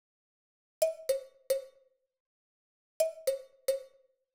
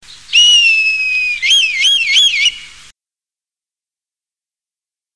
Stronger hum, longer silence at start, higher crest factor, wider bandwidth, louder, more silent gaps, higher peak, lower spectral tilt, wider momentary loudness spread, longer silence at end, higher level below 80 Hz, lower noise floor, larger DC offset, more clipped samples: neither; first, 0.8 s vs 0.1 s; first, 22 dB vs 14 dB; first, over 20 kHz vs 11 kHz; second, -35 LUFS vs -9 LUFS; first, 2.20-3.00 s vs none; second, -16 dBFS vs 0 dBFS; first, 0.5 dB/octave vs 5 dB/octave; second, 4 LU vs 7 LU; second, 0.5 s vs 2.45 s; second, -76 dBFS vs -56 dBFS; second, -69 dBFS vs under -90 dBFS; neither; neither